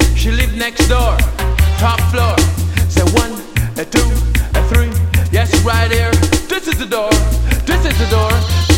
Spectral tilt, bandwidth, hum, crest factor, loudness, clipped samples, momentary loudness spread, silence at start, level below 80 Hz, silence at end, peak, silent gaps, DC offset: -5 dB/octave; 17 kHz; none; 12 dB; -14 LUFS; under 0.1%; 4 LU; 0 s; -18 dBFS; 0 s; 0 dBFS; none; under 0.1%